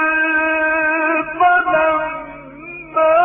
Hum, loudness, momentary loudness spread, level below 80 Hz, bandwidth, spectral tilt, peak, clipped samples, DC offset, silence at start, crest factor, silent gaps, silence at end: none; -15 LUFS; 18 LU; -50 dBFS; 3.7 kHz; -8 dB/octave; -4 dBFS; under 0.1%; under 0.1%; 0 s; 12 dB; none; 0 s